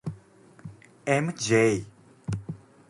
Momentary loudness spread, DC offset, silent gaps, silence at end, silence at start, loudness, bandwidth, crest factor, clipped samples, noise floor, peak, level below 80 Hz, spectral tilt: 25 LU; under 0.1%; none; 0.35 s; 0.05 s; -26 LUFS; 11.5 kHz; 20 dB; under 0.1%; -54 dBFS; -10 dBFS; -58 dBFS; -5 dB/octave